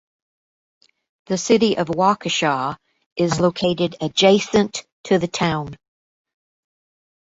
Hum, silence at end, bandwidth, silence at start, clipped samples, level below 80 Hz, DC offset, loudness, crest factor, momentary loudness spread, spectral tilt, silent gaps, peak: none; 1.55 s; 8 kHz; 1.3 s; under 0.1%; -56 dBFS; under 0.1%; -19 LUFS; 20 dB; 12 LU; -4.5 dB/octave; 3.06-3.16 s, 4.92-5.04 s; -2 dBFS